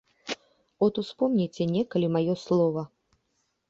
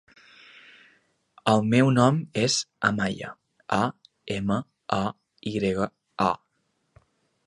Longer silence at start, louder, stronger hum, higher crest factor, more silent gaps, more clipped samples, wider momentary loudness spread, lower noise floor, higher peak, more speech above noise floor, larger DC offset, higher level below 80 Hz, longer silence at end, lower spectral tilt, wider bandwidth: second, 0.25 s vs 1.45 s; about the same, -27 LUFS vs -25 LUFS; neither; second, 16 dB vs 24 dB; neither; neither; about the same, 12 LU vs 14 LU; about the same, -75 dBFS vs -73 dBFS; second, -12 dBFS vs -4 dBFS; about the same, 50 dB vs 49 dB; neither; second, -68 dBFS vs -58 dBFS; second, 0.85 s vs 1.1 s; first, -7.5 dB/octave vs -5 dB/octave; second, 7.8 kHz vs 11.5 kHz